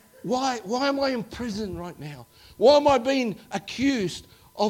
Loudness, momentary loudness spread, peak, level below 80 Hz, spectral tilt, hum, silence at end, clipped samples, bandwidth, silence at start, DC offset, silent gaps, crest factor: -24 LUFS; 19 LU; -6 dBFS; -54 dBFS; -4.5 dB/octave; none; 0 s; under 0.1%; 16.5 kHz; 0.25 s; under 0.1%; none; 20 dB